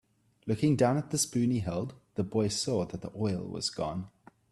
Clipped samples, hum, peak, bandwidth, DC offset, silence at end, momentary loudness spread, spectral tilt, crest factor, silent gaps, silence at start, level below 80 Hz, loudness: under 0.1%; none; -12 dBFS; 13 kHz; under 0.1%; 0.45 s; 11 LU; -5 dB/octave; 18 dB; none; 0.45 s; -60 dBFS; -31 LUFS